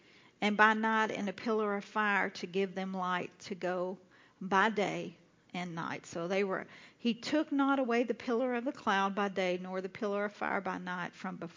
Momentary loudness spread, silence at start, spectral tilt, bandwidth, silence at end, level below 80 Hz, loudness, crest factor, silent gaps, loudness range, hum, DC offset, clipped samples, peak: 11 LU; 0.4 s; -5 dB/octave; 7.6 kHz; 0.05 s; -80 dBFS; -33 LUFS; 24 dB; none; 4 LU; none; under 0.1%; under 0.1%; -10 dBFS